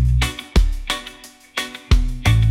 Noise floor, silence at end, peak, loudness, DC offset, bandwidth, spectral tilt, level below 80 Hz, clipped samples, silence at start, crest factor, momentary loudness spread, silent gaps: -41 dBFS; 0 s; -2 dBFS; -21 LUFS; under 0.1%; 16 kHz; -5 dB/octave; -20 dBFS; under 0.1%; 0 s; 16 dB; 10 LU; none